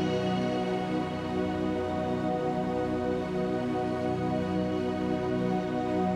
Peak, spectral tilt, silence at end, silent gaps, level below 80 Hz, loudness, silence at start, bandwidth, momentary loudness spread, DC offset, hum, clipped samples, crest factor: -16 dBFS; -7.5 dB/octave; 0 s; none; -54 dBFS; -30 LUFS; 0 s; 11 kHz; 2 LU; under 0.1%; none; under 0.1%; 12 dB